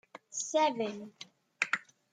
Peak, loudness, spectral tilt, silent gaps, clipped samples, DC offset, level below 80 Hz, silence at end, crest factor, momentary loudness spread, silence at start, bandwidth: -10 dBFS; -33 LUFS; -2 dB/octave; none; under 0.1%; under 0.1%; -88 dBFS; 0.3 s; 24 dB; 20 LU; 0.15 s; 9.8 kHz